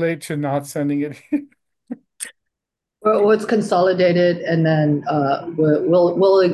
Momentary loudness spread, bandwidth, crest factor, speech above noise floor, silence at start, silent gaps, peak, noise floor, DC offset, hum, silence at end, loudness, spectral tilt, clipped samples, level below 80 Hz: 17 LU; 12.5 kHz; 14 dB; 67 dB; 0 s; none; -4 dBFS; -84 dBFS; under 0.1%; none; 0 s; -18 LUFS; -6.5 dB/octave; under 0.1%; -66 dBFS